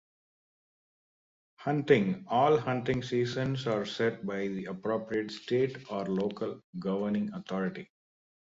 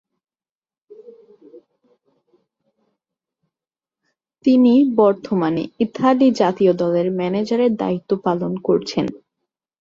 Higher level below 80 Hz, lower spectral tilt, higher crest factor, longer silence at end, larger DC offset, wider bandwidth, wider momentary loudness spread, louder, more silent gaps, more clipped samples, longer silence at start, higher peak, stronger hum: about the same, -64 dBFS vs -62 dBFS; about the same, -7 dB/octave vs -7.5 dB/octave; first, 22 dB vs 16 dB; about the same, 0.6 s vs 0.65 s; neither; about the same, 7.8 kHz vs 7.4 kHz; about the same, 11 LU vs 9 LU; second, -31 LUFS vs -18 LUFS; first, 6.64-6.73 s vs none; neither; first, 1.6 s vs 0.9 s; second, -10 dBFS vs -4 dBFS; neither